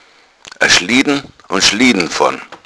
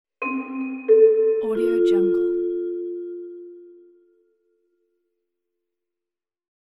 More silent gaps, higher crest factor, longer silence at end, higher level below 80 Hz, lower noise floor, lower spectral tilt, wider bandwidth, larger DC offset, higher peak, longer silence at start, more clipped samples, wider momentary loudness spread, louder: neither; about the same, 14 dB vs 18 dB; second, 0.1 s vs 2.95 s; first, -46 dBFS vs -64 dBFS; second, -42 dBFS vs -90 dBFS; second, -2 dB/octave vs -7.5 dB/octave; first, 11 kHz vs 4.2 kHz; neither; first, 0 dBFS vs -6 dBFS; first, 0.6 s vs 0.2 s; first, 0.1% vs under 0.1%; second, 8 LU vs 18 LU; first, -12 LUFS vs -21 LUFS